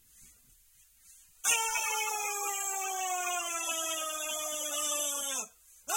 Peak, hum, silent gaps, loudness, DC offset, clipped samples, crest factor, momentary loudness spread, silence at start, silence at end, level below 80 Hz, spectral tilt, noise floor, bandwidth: -14 dBFS; none; none; -31 LUFS; under 0.1%; under 0.1%; 22 dB; 5 LU; 0.15 s; 0 s; -72 dBFS; 2.5 dB/octave; -63 dBFS; 16.5 kHz